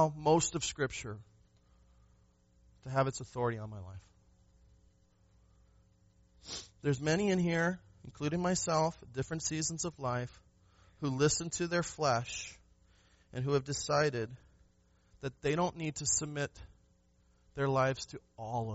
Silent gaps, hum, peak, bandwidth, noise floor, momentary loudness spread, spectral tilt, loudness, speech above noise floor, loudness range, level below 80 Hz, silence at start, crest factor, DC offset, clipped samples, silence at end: none; none; -14 dBFS; 8 kHz; -69 dBFS; 16 LU; -5 dB/octave; -34 LUFS; 35 dB; 7 LU; -60 dBFS; 0 s; 22 dB; under 0.1%; under 0.1%; 0 s